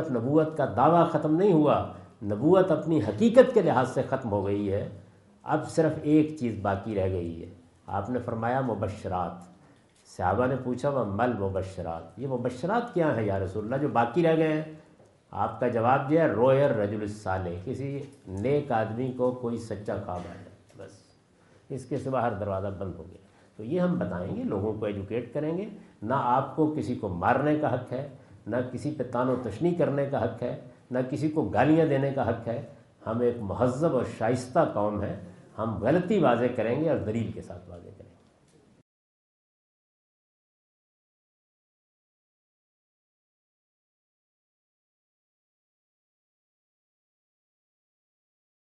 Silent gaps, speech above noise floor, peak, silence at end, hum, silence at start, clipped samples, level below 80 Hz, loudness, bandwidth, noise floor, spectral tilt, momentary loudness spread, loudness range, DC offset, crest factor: none; 34 dB; -4 dBFS; 10.7 s; none; 0 s; under 0.1%; -66 dBFS; -27 LUFS; 11.5 kHz; -60 dBFS; -8 dB/octave; 15 LU; 8 LU; under 0.1%; 24 dB